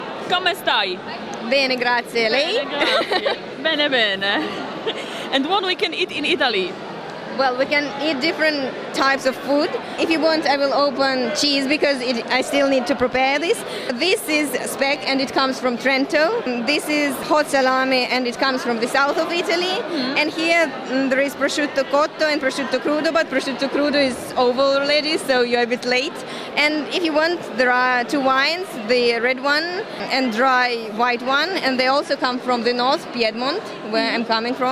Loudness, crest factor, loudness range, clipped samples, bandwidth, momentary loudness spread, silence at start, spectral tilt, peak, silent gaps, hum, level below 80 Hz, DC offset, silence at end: -19 LUFS; 18 dB; 2 LU; under 0.1%; 15.5 kHz; 6 LU; 0 s; -3 dB/octave; -2 dBFS; none; none; -60 dBFS; under 0.1%; 0 s